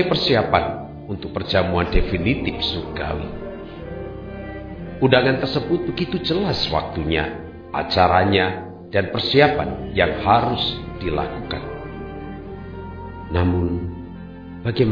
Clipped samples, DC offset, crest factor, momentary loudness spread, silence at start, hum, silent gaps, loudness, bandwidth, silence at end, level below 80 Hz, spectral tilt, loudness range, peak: under 0.1%; 0.1%; 20 dB; 17 LU; 0 s; none; none; -21 LUFS; 5.4 kHz; 0 s; -34 dBFS; -7.5 dB/octave; 7 LU; 0 dBFS